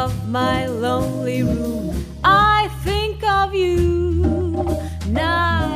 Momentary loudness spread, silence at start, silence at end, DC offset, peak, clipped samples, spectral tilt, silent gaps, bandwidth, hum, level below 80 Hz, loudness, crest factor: 8 LU; 0 s; 0 s; under 0.1%; -2 dBFS; under 0.1%; -6 dB/octave; none; 15.5 kHz; none; -30 dBFS; -19 LUFS; 18 dB